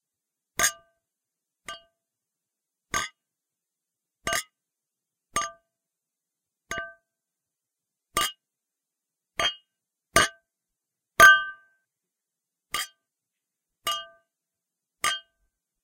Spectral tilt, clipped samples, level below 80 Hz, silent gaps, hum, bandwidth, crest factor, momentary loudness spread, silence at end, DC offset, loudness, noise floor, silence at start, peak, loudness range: 0 dB/octave; under 0.1%; -56 dBFS; none; none; 16.5 kHz; 28 dB; 21 LU; 0.65 s; under 0.1%; -24 LUFS; -87 dBFS; 0.6 s; -2 dBFS; 16 LU